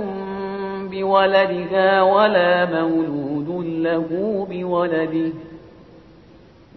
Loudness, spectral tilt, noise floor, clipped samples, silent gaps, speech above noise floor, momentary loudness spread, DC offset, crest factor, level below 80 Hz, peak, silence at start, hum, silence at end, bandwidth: -19 LUFS; -8.5 dB/octave; -47 dBFS; under 0.1%; none; 29 dB; 12 LU; under 0.1%; 16 dB; -56 dBFS; -4 dBFS; 0 s; none; 1.05 s; 5.8 kHz